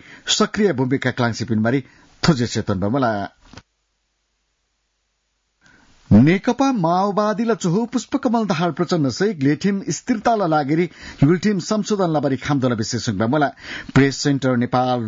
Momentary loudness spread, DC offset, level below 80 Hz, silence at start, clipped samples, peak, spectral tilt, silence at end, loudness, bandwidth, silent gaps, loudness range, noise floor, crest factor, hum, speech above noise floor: 6 LU; under 0.1%; -50 dBFS; 0.1 s; under 0.1%; -4 dBFS; -5.5 dB/octave; 0 s; -19 LUFS; 7.8 kHz; none; 5 LU; -70 dBFS; 14 dB; none; 52 dB